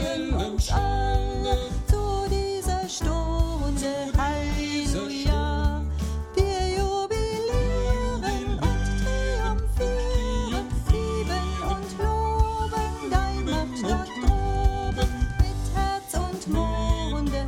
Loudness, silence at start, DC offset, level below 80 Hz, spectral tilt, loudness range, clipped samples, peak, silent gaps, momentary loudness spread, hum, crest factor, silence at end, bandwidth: -26 LUFS; 0 s; under 0.1%; -26 dBFS; -5.5 dB/octave; 1 LU; under 0.1%; -8 dBFS; none; 3 LU; none; 16 dB; 0 s; 15 kHz